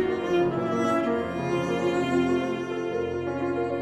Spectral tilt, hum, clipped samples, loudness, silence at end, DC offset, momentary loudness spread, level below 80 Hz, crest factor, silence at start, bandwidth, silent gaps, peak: -6.5 dB/octave; none; under 0.1%; -26 LUFS; 0 s; under 0.1%; 5 LU; -56 dBFS; 14 dB; 0 s; 10 kHz; none; -12 dBFS